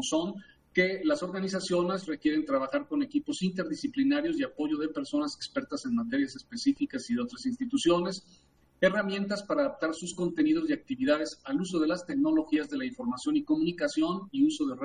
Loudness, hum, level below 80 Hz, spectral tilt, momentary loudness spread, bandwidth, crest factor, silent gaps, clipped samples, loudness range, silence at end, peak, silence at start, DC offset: -30 LUFS; none; -64 dBFS; -5 dB/octave; 6 LU; 10.5 kHz; 20 dB; none; under 0.1%; 2 LU; 0 s; -10 dBFS; 0 s; under 0.1%